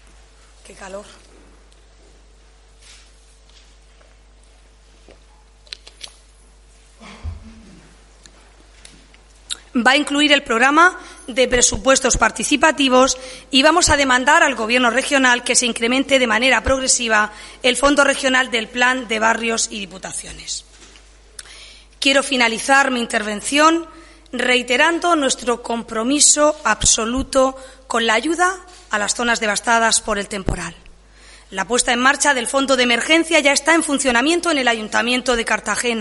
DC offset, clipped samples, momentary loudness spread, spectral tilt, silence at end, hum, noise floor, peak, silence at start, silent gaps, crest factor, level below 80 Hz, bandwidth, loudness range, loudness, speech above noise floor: under 0.1%; under 0.1%; 15 LU; -1.5 dB/octave; 0 s; none; -48 dBFS; 0 dBFS; 0.7 s; none; 18 dB; -40 dBFS; 11.5 kHz; 6 LU; -16 LUFS; 31 dB